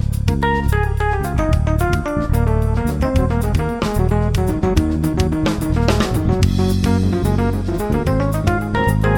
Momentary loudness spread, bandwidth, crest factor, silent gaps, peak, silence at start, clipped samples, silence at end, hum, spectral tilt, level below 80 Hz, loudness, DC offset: 3 LU; 19 kHz; 16 dB; none; 0 dBFS; 0 s; under 0.1%; 0 s; none; -7 dB/octave; -22 dBFS; -18 LUFS; under 0.1%